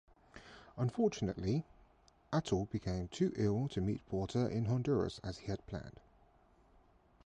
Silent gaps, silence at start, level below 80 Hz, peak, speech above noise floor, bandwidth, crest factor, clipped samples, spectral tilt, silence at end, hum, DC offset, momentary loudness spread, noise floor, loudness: none; 0.35 s; -56 dBFS; -22 dBFS; 31 dB; 10 kHz; 16 dB; under 0.1%; -7 dB/octave; 1.35 s; none; under 0.1%; 17 LU; -67 dBFS; -37 LUFS